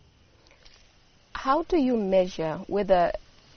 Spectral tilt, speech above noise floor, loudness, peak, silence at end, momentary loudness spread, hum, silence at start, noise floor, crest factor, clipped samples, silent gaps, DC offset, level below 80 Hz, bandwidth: -5 dB/octave; 34 dB; -25 LUFS; -10 dBFS; 0.4 s; 9 LU; none; 1.35 s; -58 dBFS; 18 dB; under 0.1%; none; under 0.1%; -48 dBFS; 6.6 kHz